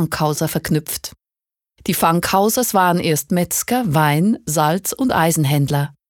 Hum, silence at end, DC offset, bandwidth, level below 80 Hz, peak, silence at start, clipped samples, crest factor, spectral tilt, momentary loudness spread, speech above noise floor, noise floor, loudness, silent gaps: none; 0.2 s; under 0.1%; 19 kHz; -48 dBFS; -2 dBFS; 0 s; under 0.1%; 16 dB; -5 dB/octave; 5 LU; 72 dB; -89 dBFS; -17 LUFS; none